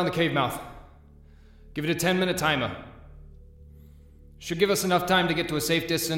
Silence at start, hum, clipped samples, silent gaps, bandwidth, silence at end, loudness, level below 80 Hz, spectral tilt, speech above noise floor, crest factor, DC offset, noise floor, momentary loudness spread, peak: 0 s; none; under 0.1%; none; 17 kHz; 0 s; -25 LUFS; -50 dBFS; -4 dB/octave; 26 dB; 18 dB; under 0.1%; -51 dBFS; 17 LU; -8 dBFS